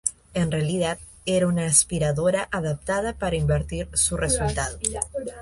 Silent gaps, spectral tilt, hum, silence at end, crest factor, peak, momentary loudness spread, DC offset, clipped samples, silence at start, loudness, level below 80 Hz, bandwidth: none; -4 dB/octave; none; 0 s; 20 dB; -4 dBFS; 9 LU; under 0.1%; under 0.1%; 0.05 s; -24 LUFS; -38 dBFS; 12 kHz